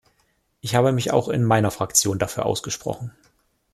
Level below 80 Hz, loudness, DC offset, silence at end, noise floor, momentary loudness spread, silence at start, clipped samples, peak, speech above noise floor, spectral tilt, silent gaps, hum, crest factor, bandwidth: -54 dBFS; -21 LUFS; under 0.1%; 0.65 s; -67 dBFS; 13 LU; 0.65 s; under 0.1%; -4 dBFS; 45 dB; -4.5 dB/octave; none; none; 20 dB; 15 kHz